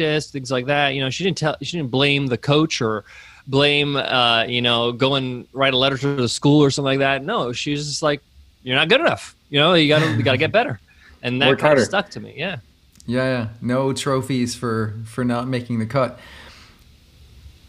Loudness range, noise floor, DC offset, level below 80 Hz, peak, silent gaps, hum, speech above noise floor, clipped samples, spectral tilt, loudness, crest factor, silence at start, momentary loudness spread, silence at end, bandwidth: 5 LU; -50 dBFS; under 0.1%; -52 dBFS; -2 dBFS; none; none; 30 dB; under 0.1%; -5 dB/octave; -19 LUFS; 18 dB; 0 s; 11 LU; 0.15 s; 13.5 kHz